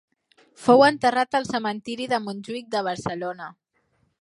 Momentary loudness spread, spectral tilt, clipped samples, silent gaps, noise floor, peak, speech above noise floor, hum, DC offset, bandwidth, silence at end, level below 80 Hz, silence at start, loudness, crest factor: 17 LU; -4.5 dB/octave; under 0.1%; none; -68 dBFS; -4 dBFS; 46 dB; none; under 0.1%; 11.5 kHz; 0.7 s; -64 dBFS; 0.6 s; -23 LUFS; 20 dB